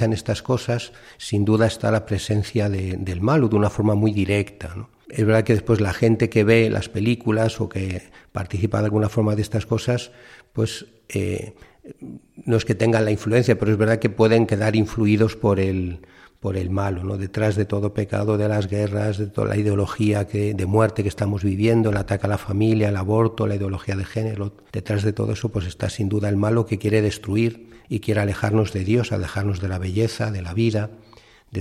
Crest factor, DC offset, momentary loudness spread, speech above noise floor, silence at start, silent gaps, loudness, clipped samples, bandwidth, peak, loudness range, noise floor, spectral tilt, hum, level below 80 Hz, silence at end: 18 dB; under 0.1%; 11 LU; 29 dB; 0 s; none; -22 LUFS; under 0.1%; 13 kHz; -2 dBFS; 4 LU; -50 dBFS; -7 dB/octave; none; -48 dBFS; 0 s